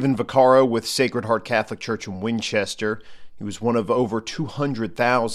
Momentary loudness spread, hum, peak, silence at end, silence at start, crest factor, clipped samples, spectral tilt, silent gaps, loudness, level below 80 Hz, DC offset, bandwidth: 12 LU; none; -4 dBFS; 0 s; 0 s; 18 dB; under 0.1%; -5 dB/octave; none; -22 LUFS; -56 dBFS; under 0.1%; 14.5 kHz